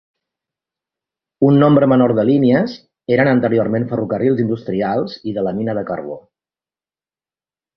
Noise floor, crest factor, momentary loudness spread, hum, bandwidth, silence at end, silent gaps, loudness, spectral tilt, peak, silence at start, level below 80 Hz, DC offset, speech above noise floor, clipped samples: under -90 dBFS; 16 dB; 13 LU; none; 6 kHz; 1.6 s; none; -16 LUFS; -10 dB/octave; -2 dBFS; 1.4 s; -54 dBFS; under 0.1%; over 75 dB; under 0.1%